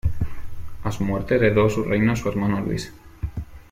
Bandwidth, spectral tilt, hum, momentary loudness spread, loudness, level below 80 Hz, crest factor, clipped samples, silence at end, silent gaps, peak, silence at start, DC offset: 16 kHz; -7 dB/octave; none; 17 LU; -23 LUFS; -36 dBFS; 16 dB; under 0.1%; 0.1 s; none; -6 dBFS; 0.05 s; under 0.1%